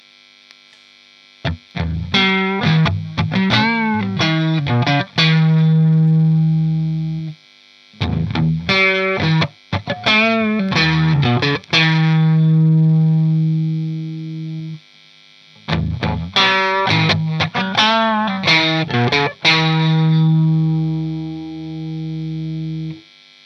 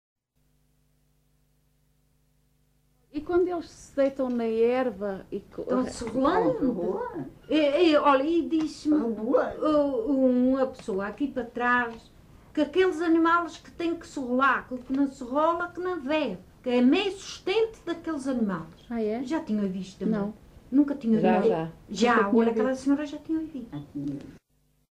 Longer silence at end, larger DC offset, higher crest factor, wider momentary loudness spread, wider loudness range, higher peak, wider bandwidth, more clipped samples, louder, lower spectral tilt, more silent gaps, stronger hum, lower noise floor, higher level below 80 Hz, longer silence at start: about the same, 0.45 s vs 0.55 s; neither; about the same, 16 dB vs 16 dB; about the same, 13 LU vs 13 LU; about the same, 5 LU vs 5 LU; first, 0 dBFS vs -10 dBFS; second, 6.4 kHz vs 11 kHz; neither; first, -16 LUFS vs -26 LUFS; about the same, -6.5 dB/octave vs -6 dB/octave; neither; about the same, 50 Hz at -50 dBFS vs 50 Hz at -60 dBFS; second, -48 dBFS vs -69 dBFS; first, -42 dBFS vs -56 dBFS; second, 1.45 s vs 3.15 s